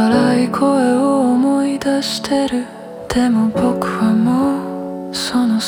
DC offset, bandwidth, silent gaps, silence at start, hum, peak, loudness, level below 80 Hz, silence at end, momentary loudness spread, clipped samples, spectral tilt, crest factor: under 0.1%; 16 kHz; none; 0 s; none; -2 dBFS; -16 LUFS; -46 dBFS; 0 s; 9 LU; under 0.1%; -5.5 dB/octave; 14 dB